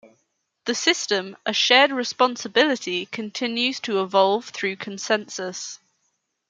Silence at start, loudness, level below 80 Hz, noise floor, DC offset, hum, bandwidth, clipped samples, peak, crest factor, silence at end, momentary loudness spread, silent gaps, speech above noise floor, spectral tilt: 0.05 s; -22 LUFS; -76 dBFS; -73 dBFS; under 0.1%; none; 9.6 kHz; under 0.1%; -2 dBFS; 22 dB; 0.75 s; 14 LU; none; 51 dB; -2 dB/octave